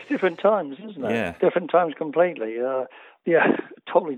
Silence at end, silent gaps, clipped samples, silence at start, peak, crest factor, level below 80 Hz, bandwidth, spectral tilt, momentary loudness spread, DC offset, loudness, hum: 0 s; none; under 0.1%; 0 s; -4 dBFS; 18 dB; -66 dBFS; 8.2 kHz; -7.5 dB/octave; 10 LU; under 0.1%; -23 LUFS; none